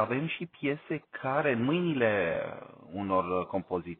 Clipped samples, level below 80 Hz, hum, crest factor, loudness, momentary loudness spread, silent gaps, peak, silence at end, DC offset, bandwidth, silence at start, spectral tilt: under 0.1%; -66 dBFS; none; 18 dB; -31 LUFS; 11 LU; none; -14 dBFS; 0.05 s; under 0.1%; 4.3 kHz; 0 s; -5 dB/octave